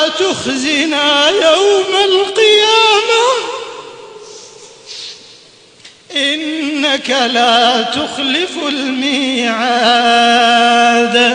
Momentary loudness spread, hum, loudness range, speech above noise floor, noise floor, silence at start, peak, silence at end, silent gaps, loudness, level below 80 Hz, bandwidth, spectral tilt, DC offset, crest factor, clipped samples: 15 LU; none; 10 LU; 30 dB; -42 dBFS; 0 s; 0 dBFS; 0 s; none; -11 LUFS; -58 dBFS; 10.5 kHz; -1.5 dB/octave; under 0.1%; 12 dB; under 0.1%